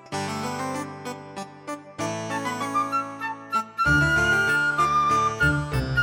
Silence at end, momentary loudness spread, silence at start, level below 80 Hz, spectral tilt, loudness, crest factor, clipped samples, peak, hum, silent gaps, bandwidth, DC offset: 0 s; 16 LU; 0.05 s; -42 dBFS; -4.5 dB/octave; -23 LUFS; 16 dB; under 0.1%; -10 dBFS; none; none; 18.5 kHz; under 0.1%